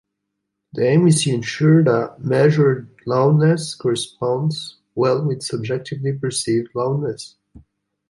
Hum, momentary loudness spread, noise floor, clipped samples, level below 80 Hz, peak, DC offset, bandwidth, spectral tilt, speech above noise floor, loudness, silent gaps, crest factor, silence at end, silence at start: none; 11 LU; -77 dBFS; under 0.1%; -60 dBFS; -2 dBFS; under 0.1%; 11.5 kHz; -6 dB/octave; 59 dB; -19 LUFS; none; 16 dB; 0.5 s; 0.75 s